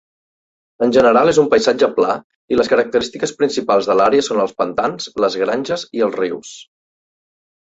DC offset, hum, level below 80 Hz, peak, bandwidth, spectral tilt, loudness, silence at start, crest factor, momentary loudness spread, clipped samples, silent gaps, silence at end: under 0.1%; none; -54 dBFS; -2 dBFS; 8 kHz; -4.5 dB/octave; -16 LUFS; 0.8 s; 16 dB; 10 LU; under 0.1%; 2.24-2.48 s; 1.15 s